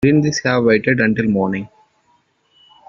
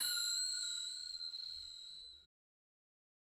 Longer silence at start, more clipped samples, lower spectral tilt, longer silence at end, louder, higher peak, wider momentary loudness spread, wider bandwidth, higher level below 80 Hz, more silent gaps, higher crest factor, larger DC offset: about the same, 0 s vs 0 s; neither; first, -5.5 dB/octave vs 4 dB/octave; first, 1.2 s vs 1 s; first, -16 LUFS vs -40 LUFS; first, -2 dBFS vs -26 dBFS; second, 9 LU vs 15 LU; second, 7.4 kHz vs 19 kHz; first, -50 dBFS vs -78 dBFS; neither; about the same, 14 dB vs 18 dB; neither